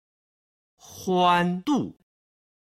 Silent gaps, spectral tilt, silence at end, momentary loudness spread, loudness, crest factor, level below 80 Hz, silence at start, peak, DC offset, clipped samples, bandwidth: none; -5.5 dB/octave; 0.75 s; 14 LU; -23 LUFS; 20 dB; -66 dBFS; 0.9 s; -8 dBFS; under 0.1%; under 0.1%; 15 kHz